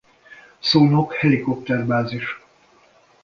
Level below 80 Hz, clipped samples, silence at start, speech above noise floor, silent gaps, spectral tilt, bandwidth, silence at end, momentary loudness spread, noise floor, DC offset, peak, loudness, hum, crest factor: -56 dBFS; under 0.1%; 0.3 s; 36 dB; none; -7 dB/octave; 7.2 kHz; 0.85 s; 13 LU; -55 dBFS; under 0.1%; -2 dBFS; -19 LUFS; none; 18 dB